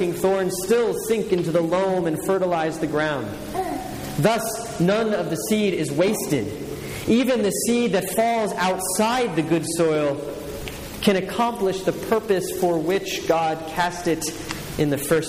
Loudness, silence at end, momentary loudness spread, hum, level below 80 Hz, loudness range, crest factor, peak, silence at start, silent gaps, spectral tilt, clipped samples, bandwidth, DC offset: -22 LUFS; 0 s; 8 LU; none; -48 dBFS; 2 LU; 18 dB; -6 dBFS; 0 s; none; -4.5 dB/octave; under 0.1%; 15.5 kHz; under 0.1%